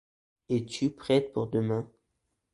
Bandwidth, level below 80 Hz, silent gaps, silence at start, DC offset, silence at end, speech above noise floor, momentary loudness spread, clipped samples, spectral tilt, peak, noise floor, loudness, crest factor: 11.5 kHz; -64 dBFS; none; 0.5 s; under 0.1%; 0.65 s; 51 dB; 6 LU; under 0.1%; -6.5 dB/octave; -12 dBFS; -80 dBFS; -30 LUFS; 18 dB